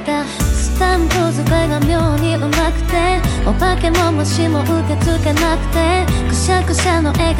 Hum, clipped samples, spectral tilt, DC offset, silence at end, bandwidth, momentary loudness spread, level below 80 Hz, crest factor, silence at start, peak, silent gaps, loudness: none; under 0.1%; -5.5 dB/octave; under 0.1%; 0 s; 17 kHz; 2 LU; -20 dBFS; 14 dB; 0 s; 0 dBFS; none; -15 LUFS